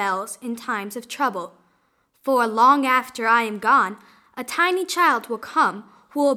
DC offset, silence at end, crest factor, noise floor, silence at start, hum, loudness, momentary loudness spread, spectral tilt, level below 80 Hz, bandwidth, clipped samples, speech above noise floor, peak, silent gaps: under 0.1%; 0 s; 18 dB; -65 dBFS; 0 s; none; -20 LUFS; 16 LU; -3 dB/octave; -74 dBFS; 19.5 kHz; under 0.1%; 44 dB; -4 dBFS; none